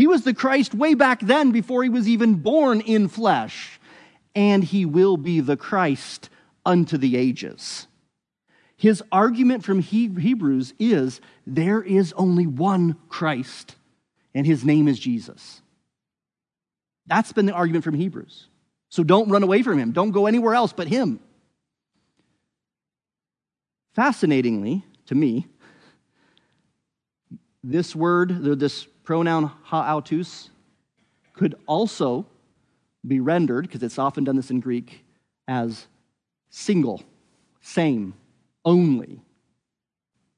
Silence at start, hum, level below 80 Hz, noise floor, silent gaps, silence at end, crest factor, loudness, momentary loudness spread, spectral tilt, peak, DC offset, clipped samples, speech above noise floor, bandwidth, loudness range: 0 s; none; -74 dBFS; under -90 dBFS; none; 1.2 s; 20 dB; -21 LUFS; 13 LU; -7 dB/octave; -2 dBFS; under 0.1%; under 0.1%; over 70 dB; 10.5 kHz; 7 LU